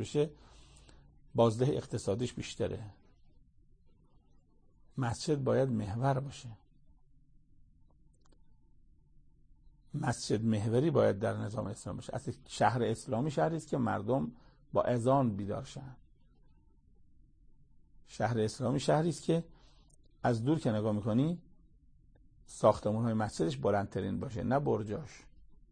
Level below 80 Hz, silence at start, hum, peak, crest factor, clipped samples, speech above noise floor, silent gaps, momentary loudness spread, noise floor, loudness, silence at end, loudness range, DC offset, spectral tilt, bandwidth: -60 dBFS; 0 s; none; -12 dBFS; 22 dB; under 0.1%; 31 dB; none; 13 LU; -63 dBFS; -33 LUFS; 0.15 s; 8 LU; under 0.1%; -6.5 dB/octave; 9.8 kHz